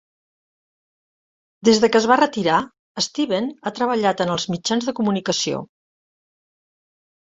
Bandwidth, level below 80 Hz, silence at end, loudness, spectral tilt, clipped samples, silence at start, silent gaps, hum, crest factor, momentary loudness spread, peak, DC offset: 8.2 kHz; -62 dBFS; 1.75 s; -20 LUFS; -4 dB/octave; under 0.1%; 1.65 s; 2.79-2.95 s; none; 20 dB; 9 LU; -2 dBFS; under 0.1%